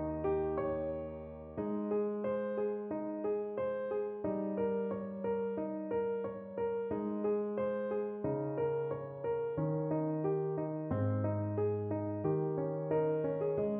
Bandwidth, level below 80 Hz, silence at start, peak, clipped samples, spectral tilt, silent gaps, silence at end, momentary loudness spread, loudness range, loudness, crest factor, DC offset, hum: 3.6 kHz; -62 dBFS; 0 s; -22 dBFS; under 0.1%; -9.5 dB/octave; none; 0 s; 5 LU; 2 LU; -36 LUFS; 14 dB; under 0.1%; none